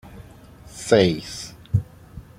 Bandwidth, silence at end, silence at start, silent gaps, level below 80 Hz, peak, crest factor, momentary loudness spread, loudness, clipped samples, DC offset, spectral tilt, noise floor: 15.5 kHz; 0.2 s; 0.05 s; none; -46 dBFS; 0 dBFS; 24 dB; 25 LU; -22 LUFS; under 0.1%; under 0.1%; -5.5 dB/octave; -45 dBFS